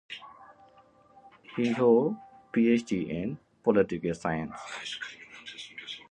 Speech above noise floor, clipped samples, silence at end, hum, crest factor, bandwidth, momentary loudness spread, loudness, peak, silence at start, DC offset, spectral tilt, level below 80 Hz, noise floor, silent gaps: 32 dB; under 0.1%; 0.1 s; none; 20 dB; 9.6 kHz; 18 LU; -29 LUFS; -10 dBFS; 0.1 s; under 0.1%; -6 dB/octave; -62 dBFS; -59 dBFS; none